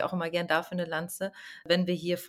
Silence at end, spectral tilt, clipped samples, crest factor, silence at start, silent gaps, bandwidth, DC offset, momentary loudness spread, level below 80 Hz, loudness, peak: 0 s; -5 dB/octave; under 0.1%; 20 dB; 0 s; none; 16.5 kHz; under 0.1%; 9 LU; -72 dBFS; -30 LUFS; -10 dBFS